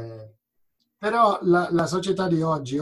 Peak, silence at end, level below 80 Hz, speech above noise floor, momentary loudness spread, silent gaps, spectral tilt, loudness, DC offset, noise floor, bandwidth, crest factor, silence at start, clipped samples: -6 dBFS; 0 s; -60 dBFS; 50 dB; 7 LU; none; -6.5 dB/octave; -22 LUFS; under 0.1%; -72 dBFS; 12 kHz; 18 dB; 0 s; under 0.1%